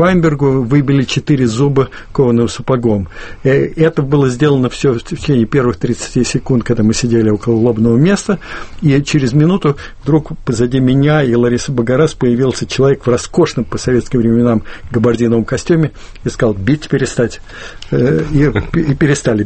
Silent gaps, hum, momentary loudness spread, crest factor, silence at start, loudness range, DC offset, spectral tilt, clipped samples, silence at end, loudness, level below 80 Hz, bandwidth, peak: none; none; 7 LU; 12 dB; 0 s; 2 LU; under 0.1%; -6.5 dB/octave; under 0.1%; 0 s; -13 LUFS; -32 dBFS; 8.8 kHz; 0 dBFS